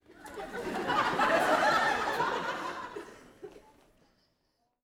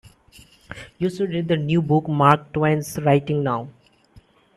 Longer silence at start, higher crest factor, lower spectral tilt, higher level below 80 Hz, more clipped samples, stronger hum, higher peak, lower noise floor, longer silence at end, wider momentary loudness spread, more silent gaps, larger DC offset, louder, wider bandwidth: about the same, 0.1 s vs 0.05 s; about the same, 18 dB vs 22 dB; second, -3.5 dB/octave vs -7 dB/octave; second, -62 dBFS vs -54 dBFS; neither; neither; second, -14 dBFS vs 0 dBFS; first, -77 dBFS vs -53 dBFS; first, 1.25 s vs 0.85 s; first, 25 LU vs 20 LU; neither; neither; second, -29 LUFS vs -21 LUFS; first, over 20 kHz vs 14 kHz